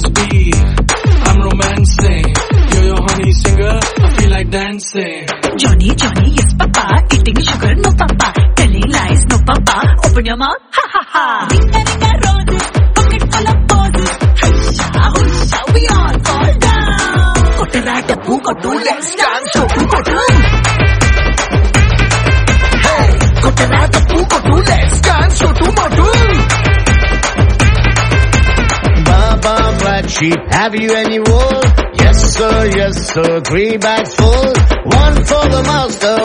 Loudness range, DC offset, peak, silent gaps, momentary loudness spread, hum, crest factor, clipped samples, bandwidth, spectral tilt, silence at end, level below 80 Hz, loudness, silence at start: 2 LU; under 0.1%; 0 dBFS; none; 4 LU; none; 10 dB; under 0.1%; 10.5 kHz; -5 dB/octave; 0 s; -14 dBFS; -11 LUFS; 0 s